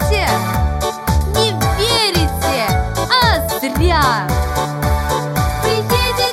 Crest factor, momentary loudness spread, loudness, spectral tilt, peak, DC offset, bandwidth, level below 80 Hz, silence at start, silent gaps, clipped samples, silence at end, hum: 14 dB; 5 LU; -16 LUFS; -4.5 dB/octave; -2 dBFS; under 0.1%; 17 kHz; -24 dBFS; 0 s; none; under 0.1%; 0 s; none